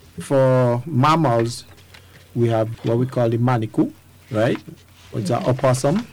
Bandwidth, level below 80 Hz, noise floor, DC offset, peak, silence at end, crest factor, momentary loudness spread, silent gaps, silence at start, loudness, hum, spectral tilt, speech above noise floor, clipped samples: 15 kHz; -52 dBFS; -46 dBFS; under 0.1%; -10 dBFS; 0.05 s; 10 dB; 11 LU; none; 0.15 s; -20 LUFS; none; -7 dB/octave; 27 dB; under 0.1%